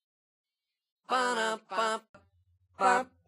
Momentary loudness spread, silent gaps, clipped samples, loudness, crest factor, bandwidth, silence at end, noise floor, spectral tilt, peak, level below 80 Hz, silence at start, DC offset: 6 LU; 2.09-2.14 s; under 0.1%; -30 LUFS; 22 dB; 15.5 kHz; 0.2 s; -69 dBFS; -2 dB/octave; -12 dBFS; -82 dBFS; 1.1 s; under 0.1%